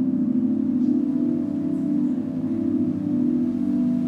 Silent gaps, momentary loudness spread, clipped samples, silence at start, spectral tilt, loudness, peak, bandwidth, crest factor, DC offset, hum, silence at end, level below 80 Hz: none; 3 LU; under 0.1%; 0 s; -10.5 dB/octave; -23 LUFS; -10 dBFS; 3.7 kHz; 12 dB; under 0.1%; none; 0 s; -60 dBFS